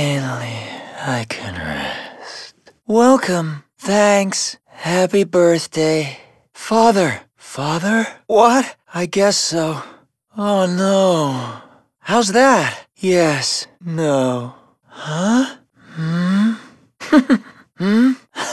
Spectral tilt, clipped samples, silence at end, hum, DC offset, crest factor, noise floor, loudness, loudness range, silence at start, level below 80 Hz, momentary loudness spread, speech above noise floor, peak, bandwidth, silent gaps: -4.5 dB/octave; under 0.1%; 0 s; none; under 0.1%; 18 dB; -41 dBFS; -17 LUFS; 4 LU; 0 s; -58 dBFS; 16 LU; 25 dB; 0 dBFS; 12 kHz; none